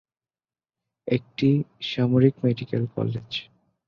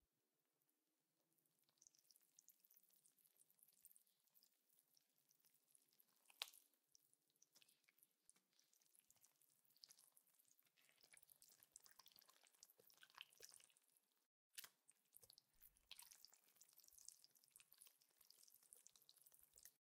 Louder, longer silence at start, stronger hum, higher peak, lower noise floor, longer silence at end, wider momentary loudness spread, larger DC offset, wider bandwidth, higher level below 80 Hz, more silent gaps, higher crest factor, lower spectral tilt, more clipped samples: first, -24 LUFS vs -64 LUFS; first, 1.05 s vs 0 s; neither; first, -4 dBFS vs -26 dBFS; about the same, under -90 dBFS vs under -90 dBFS; first, 0.45 s vs 0.05 s; about the same, 12 LU vs 13 LU; neither; second, 6.8 kHz vs 16 kHz; first, -60 dBFS vs under -90 dBFS; second, none vs 14.26-14.51 s; second, 20 dB vs 46 dB; first, -8.5 dB/octave vs 1.5 dB/octave; neither